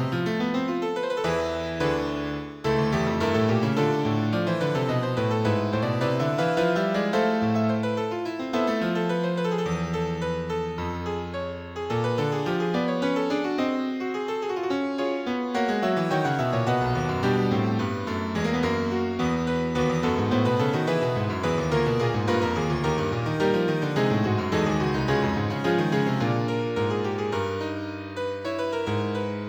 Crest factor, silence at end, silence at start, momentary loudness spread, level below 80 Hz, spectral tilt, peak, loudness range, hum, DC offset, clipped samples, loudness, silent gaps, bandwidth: 14 dB; 0 s; 0 s; 6 LU; -48 dBFS; -6.5 dB/octave; -10 dBFS; 3 LU; none; under 0.1%; under 0.1%; -25 LUFS; none; over 20 kHz